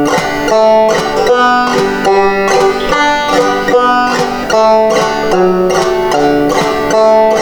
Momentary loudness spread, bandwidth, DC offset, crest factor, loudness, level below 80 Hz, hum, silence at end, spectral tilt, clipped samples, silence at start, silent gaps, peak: 4 LU; over 20 kHz; under 0.1%; 10 dB; -10 LUFS; -34 dBFS; none; 0 s; -4 dB/octave; under 0.1%; 0 s; none; 0 dBFS